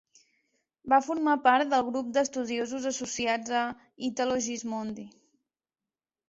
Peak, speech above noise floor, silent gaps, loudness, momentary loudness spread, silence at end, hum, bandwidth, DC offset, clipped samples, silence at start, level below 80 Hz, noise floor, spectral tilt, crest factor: -10 dBFS; over 62 dB; none; -28 LUFS; 12 LU; 1.2 s; none; 8 kHz; under 0.1%; under 0.1%; 0.85 s; -70 dBFS; under -90 dBFS; -2.5 dB/octave; 20 dB